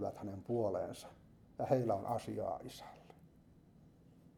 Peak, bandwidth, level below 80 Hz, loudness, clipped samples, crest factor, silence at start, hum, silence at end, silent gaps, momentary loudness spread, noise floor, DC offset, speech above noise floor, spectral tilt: -20 dBFS; 19 kHz; -70 dBFS; -39 LUFS; under 0.1%; 22 dB; 0 s; none; 0.1 s; none; 21 LU; -64 dBFS; under 0.1%; 26 dB; -7.5 dB/octave